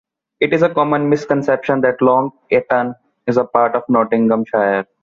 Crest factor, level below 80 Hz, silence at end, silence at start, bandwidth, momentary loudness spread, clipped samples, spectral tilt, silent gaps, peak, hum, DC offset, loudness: 14 dB; -58 dBFS; 0.2 s; 0.4 s; 7.4 kHz; 4 LU; under 0.1%; -7.5 dB/octave; none; -2 dBFS; none; under 0.1%; -16 LUFS